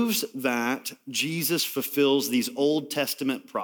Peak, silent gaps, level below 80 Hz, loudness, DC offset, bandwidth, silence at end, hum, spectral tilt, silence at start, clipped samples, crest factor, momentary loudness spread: -12 dBFS; none; -80 dBFS; -26 LUFS; under 0.1%; over 20 kHz; 0 s; none; -3.5 dB/octave; 0 s; under 0.1%; 16 dB; 6 LU